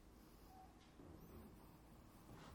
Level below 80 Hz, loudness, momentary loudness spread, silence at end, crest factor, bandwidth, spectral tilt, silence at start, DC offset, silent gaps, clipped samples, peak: -70 dBFS; -63 LUFS; 4 LU; 0 s; 16 dB; 18 kHz; -5.5 dB/octave; 0 s; under 0.1%; none; under 0.1%; -46 dBFS